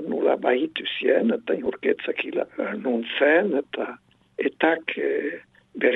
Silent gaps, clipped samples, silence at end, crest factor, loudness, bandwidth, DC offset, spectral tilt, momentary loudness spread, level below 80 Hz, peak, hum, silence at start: none; under 0.1%; 0 s; 20 dB; -24 LUFS; 4.1 kHz; under 0.1%; -7 dB/octave; 11 LU; -70 dBFS; -4 dBFS; none; 0 s